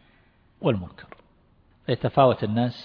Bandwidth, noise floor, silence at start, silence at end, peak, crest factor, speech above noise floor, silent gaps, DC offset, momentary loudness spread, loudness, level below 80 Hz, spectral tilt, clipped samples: 5.4 kHz; -59 dBFS; 0.6 s; 0 s; -4 dBFS; 22 dB; 37 dB; none; under 0.1%; 15 LU; -24 LUFS; -56 dBFS; -9.5 dB/octave; under 0.1%